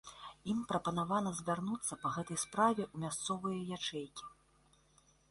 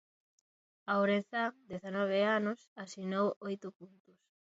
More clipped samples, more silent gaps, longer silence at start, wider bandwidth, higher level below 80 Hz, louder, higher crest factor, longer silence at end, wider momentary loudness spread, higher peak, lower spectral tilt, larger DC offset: neither; second, none vs 2.68-2.76 s, 3.36-3.41 s, 3.75-3.80 s; second, 0.05 s vs 0.85 s; first, 12 kHz vs 7.6 kHz; first, -70 dBFS vs -80 dBFS; second, -37 LUFS vs -34 LUFS; about the same, 20 dB vs 18 dB; first, 1 s vs 0.75 s; about the same, 14 LU vs 15 LU; about the same, -18 dBFS vs -18 dBFS; about the same, -4.5 dB/octave vs -4 dB/octave; neither